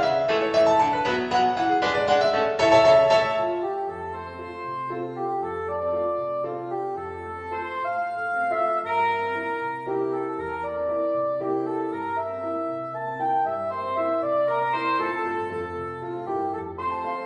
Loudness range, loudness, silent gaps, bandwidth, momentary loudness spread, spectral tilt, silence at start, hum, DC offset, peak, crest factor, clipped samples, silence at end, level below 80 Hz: 9 LU; -25 LUFS; none; 9.4 kHz; 12 LU; -5 dB/octave; 0 s; none; under 0.1%; -6 dBFS; 18 dB; under 0.1%; 0 s; -58 dBFS